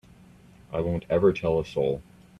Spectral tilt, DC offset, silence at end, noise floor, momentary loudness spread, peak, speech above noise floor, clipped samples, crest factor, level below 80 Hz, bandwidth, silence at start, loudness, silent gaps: -8 dB/octave; under 0.1%; 0.4 s; -52 dBFS; 10 LU; -10 dBFS; 28 dB; under 0.1%; 18 dB; -50 dBFS; 10.5 kHz; 0.7 s; -26 LUFS; none